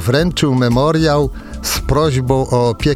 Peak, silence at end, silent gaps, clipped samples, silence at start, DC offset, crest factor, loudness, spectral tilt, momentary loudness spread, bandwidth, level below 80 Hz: -2 dBFS; 0 s; none; under 0.1%; 0 s; under 0.1%; 12 dB; -15 LUFS; -5.5 dB/octave; 6 LU; 16 kHz; -28 dBFS